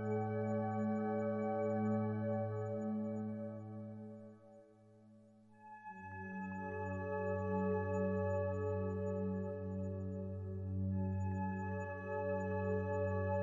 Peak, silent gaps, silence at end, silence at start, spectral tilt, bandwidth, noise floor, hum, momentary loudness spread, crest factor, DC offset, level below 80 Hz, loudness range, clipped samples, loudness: -26 dBFS; none; 0 s; 0 s; -10.5 dB/octave; 7.4 kHz; -63 dBFS; none; 12 LU; 14 dB; under 0.1%; -76 dBFS; 10 LU; under 0.1%; -40 LUFS